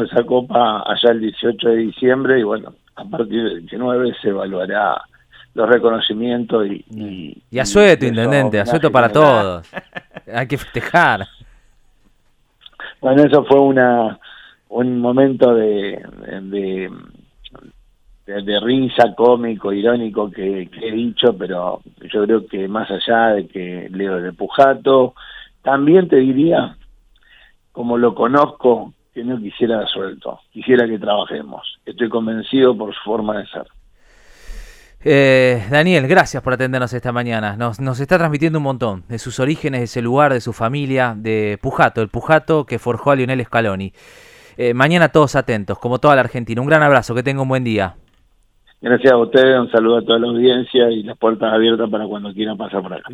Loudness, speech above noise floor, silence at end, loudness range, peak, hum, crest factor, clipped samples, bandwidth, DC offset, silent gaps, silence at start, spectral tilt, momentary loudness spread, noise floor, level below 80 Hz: -16 LUFS; 41 dB; 0 s; 5 LU; 0 dBFS; none; 16 dB; under 0.1%; 13 kHz; under 0.1%; none; 0 s; -6 dB/octave; 15 LU; -57 dBFS; -48 dBFS